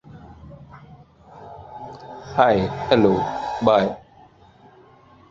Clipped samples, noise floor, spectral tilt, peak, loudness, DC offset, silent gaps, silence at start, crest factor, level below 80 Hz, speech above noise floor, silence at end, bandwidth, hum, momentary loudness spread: under 0.1%; -51 dBFS; -7 dB/octave; -2 dBFS; -20 LUFS; under 0.1%; none; 0.05 s; 22 dB; -50 dBFS; 32 dB; 1.3 s; 7.6 kHz; none; 26 LU